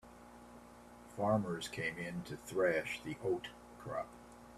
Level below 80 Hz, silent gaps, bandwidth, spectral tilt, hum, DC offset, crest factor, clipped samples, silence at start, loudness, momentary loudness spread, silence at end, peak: -66 dBFS; none; 14.5 kHz; -5.5 dB/octave; 60 Hz at -65 dBFS; under 0.1%; 20 dB; under 0.1%; 0.05 s; -38 LUFS; 22 LU; 0 s; -20 dBFS